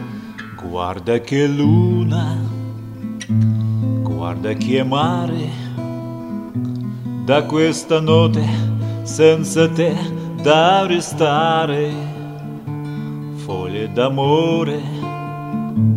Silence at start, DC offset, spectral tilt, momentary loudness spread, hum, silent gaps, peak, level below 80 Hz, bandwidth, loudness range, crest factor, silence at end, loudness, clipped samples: 0 s; under 0.1%; -6.5 dB/octave; 14 LU; none; none; 0 dBFS; -52 dBFS; 13 kHz; 5 LU; 18 dB; 0 s; -18 LUFS; under 0.1%